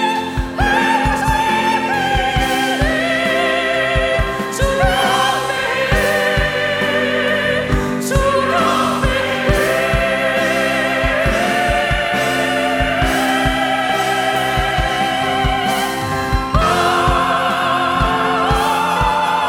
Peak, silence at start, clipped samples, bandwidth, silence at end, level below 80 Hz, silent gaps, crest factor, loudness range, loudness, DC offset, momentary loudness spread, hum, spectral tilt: -2 dBFS; 0 s; under 0.1%; 19 kHz; 0 s; -26 dBFS; none; 14 dB; 1 LU; -16 LUFS; under 0.1%; 3 LU; none; -4.5 dB/octave